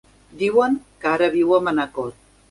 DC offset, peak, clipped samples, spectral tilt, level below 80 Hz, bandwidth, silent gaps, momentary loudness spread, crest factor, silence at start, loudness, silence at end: under 0.1%; -4 dBFS; under 0.1%; -6 dB/octave; -56 dBFS; 11.5 kHz; none; 10 LU; 16 dB; 0.35 s; -20 LUFS; 0.4 s